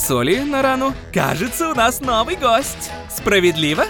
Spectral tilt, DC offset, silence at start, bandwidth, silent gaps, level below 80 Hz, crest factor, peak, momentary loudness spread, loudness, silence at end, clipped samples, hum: -4 dB/octave; under 0.1%; 0 s; 19.5 kHz; none; -40 dBFS; 14 dB; -4 dBFS; 7 LU; -17 LUFS; 0 s; under 0.1%; none